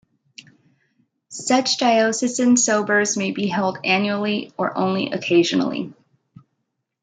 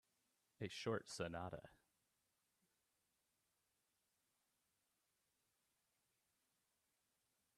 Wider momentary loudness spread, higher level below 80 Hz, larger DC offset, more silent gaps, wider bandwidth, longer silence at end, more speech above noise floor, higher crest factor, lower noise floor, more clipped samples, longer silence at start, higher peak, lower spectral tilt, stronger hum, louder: about the same, 9 LU vs 11 LU; first, -70 dBFS vs -82 dBFS; neither; neither; second, 9.6 kHz vs 13 kHz; second, 1.1 s vs 5.8 s; first, 56 dB vs 39 dB; second, 16 dB vs 26 dB; second, -76 dBFS vs -88 dBFS; neither; first, 1.3 s vs 0.6 s; first, -4 dBFS vs -30 dBFS; about the same, -3.5 dB/octave vs -4.5 dB/octave; neither; first, -19 LUFS vs -49 LUFS